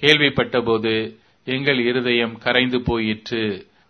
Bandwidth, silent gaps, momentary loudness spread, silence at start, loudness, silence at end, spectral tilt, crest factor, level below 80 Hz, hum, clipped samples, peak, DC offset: 11 kHz; none; 9 LU; 0 s; -20 LUFS; 0.25 s; -5.5 dB/octave; 20 dB; -46 dBFS; none; under 0.1%; 0 dBFS; under 0.1%